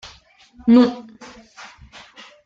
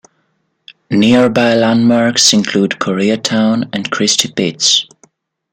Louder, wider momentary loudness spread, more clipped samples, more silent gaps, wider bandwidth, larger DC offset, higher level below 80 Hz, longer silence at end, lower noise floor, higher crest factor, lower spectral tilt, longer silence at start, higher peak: second, -16 LUFS vs -12 LUFS; first, 27 LU vs 7 LU; neither; neither; second, 7.4 kHz vs 16.5 kHz; neither; about the same, -54 dBFS vs -54 dBFS; first, 1.45 s vs 0.7 s; second, -46 dBFS vs -63 dBFS; about the same, 18 dB vs 14 dB; first, -6.5 dB/octave vs -3.5 dB/octave; about the same, 0.65 s vs 0.7 s; about the same, -2 dBFS vs 0 dBFS